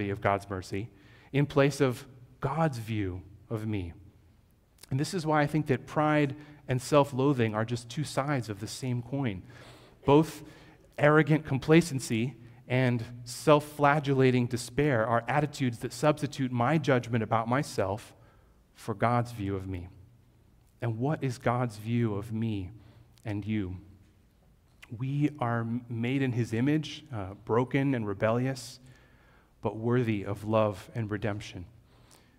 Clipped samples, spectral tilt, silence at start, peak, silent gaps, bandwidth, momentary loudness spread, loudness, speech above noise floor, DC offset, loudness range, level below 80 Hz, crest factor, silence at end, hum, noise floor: under 0.1%; -6.5 dB/octave; 0 s; -6 dBFS; none; 16 kHz; 14 LU; -29 LUFS; 34 dB; under 0.1%; 7 LU; -58 dBFS; 22 dB; 0.7 s; none; -62 dBFS